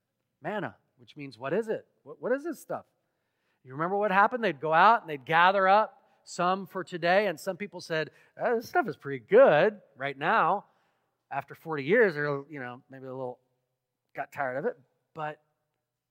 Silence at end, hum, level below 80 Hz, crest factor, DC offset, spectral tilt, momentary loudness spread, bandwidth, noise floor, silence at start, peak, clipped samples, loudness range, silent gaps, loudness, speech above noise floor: 0.75 s; none; -86 dBFS; 22 dB; under 0.1%; -5.5 dB/octave; 19 LU; 16 kHz; -83 dBFS; 0.45 s; -8 dBFS; under 0.1%; 11 LU; none; -27 LUFS; 56 dB